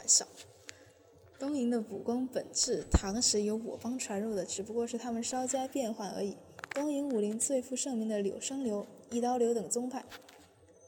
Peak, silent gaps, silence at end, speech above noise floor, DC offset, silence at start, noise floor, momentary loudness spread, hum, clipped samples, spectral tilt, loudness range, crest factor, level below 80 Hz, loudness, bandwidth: -10 dBFS; none; 0 s; 27 dB; under 0.1%; 0 s; -60 dBFS; 12 LU; none; under 0.1%; -3.5 dB/octave; 3 LU; 24 dB; -48 dBFS; -33 LUFS; 19 kHz